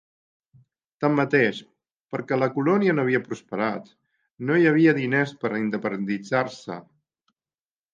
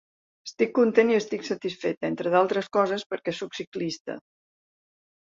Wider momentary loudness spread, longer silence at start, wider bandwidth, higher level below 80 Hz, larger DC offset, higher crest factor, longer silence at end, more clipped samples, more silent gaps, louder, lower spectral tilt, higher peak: about the same, 15 LU vs 15 LU; first, 1 s vs 0.45 s; about the same, 7.6 kHz vs 7.6 kHz; about the same, -72 dBFS vs -72 dBFS; neither; about the same, 18 dB vs 20 dB; about the same, 1.15 s vs 1.2 s; neither; second, 2.01-2.08 s vs 1.97-2.01 s, 3.06-3.10 s, 3.67-3.72 s, 4.00-4.05 s; first, -23 LUFS vs -26 LUFS; first, -7.5 dB/octave vs -5 dB/octave; about the same, -6 dBFS vs -6 dBFS